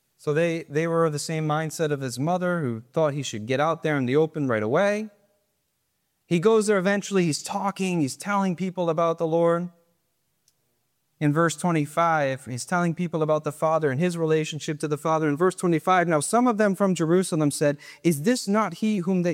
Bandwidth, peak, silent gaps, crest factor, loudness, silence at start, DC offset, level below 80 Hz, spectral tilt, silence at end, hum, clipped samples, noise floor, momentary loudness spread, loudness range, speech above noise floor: 16 kHz; -8 dBFS; none; 16 dB; -24 LUFS; 0.25 s; under 0.1%; -72 dBFS; -5.5 dB/octave; 0 s; none; under 0.1%; -74 dBFS; 6 LU; 4 LU; 51 dB